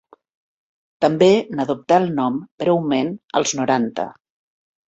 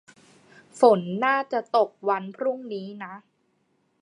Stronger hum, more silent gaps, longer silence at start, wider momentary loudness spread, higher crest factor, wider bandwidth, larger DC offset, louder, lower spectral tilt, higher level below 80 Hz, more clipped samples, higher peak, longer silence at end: neither; first, 2.51-2.58 s vs none; first, 1 s vs 0.75 s; second, 9 LU vs 17 LU; about the same, 18 dB vs 22 dB; second, 8.2 kHz vs 11 kHz; neither; first, -19 LUFS vs -24 LUFS; about the same, -5 dB/octave vs -6 dB/octave; first, -62 dBFS vs -82 dBFS; neither; about the same, -2 dBFS vs -4 dBFS; about the same, 0.75 s vs 0.8 s